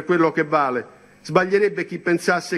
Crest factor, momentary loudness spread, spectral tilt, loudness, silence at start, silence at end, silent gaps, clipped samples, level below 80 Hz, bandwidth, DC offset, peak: 18 dB; 7 LU; -5.5 dB/octave; -20 LUFS; 0 s; 0 s; none; under 0.1%; -66 dBFS; 13 kHz; under 0.1%; -2 dBFS